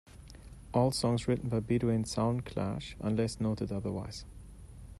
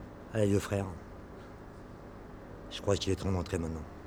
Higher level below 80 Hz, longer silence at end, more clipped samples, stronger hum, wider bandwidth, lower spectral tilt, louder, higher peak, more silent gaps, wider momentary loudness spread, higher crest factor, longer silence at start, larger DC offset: about the same, -52 dBFS vs -50 dBFS; about the same, 0.05 s vs 0 s; neither; neither; second, 12.5 kHz vs 17 kHz; about the same, -6.5 dB/octave vs -6 dB/octave; about the same, -33 LUFS vs -33 LUFS; about the same, -14 dBFS vs -14 dBFS; neither; first, 22 LU vs 19 LU; about the same, 18 dB vs 22 dB; about the same, 0.1 s vs 0 s; neither